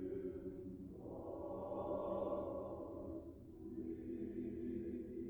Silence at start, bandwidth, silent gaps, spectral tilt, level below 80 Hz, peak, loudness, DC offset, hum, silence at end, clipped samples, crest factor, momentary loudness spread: 0 s; over 20 kHz; none; -10 dB/octave; -64 dBFS; -30 dBFS; -47 LUFS; under 0.1%; none; 0 s; under 0.1%; 16 dB; 9 LU